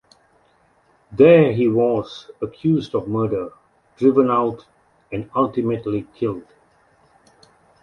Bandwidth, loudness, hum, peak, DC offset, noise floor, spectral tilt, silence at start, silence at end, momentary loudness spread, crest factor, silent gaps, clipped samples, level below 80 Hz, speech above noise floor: 6.6 kHz; -19 LUFS; none; -2 dBFS; under 0.1%; -59 dBFS; -9 dB/octave; 1.1 s; 1.4 s; 18 LU; 18 dB; none; under 0.1%; -56 dBFS; 41 dB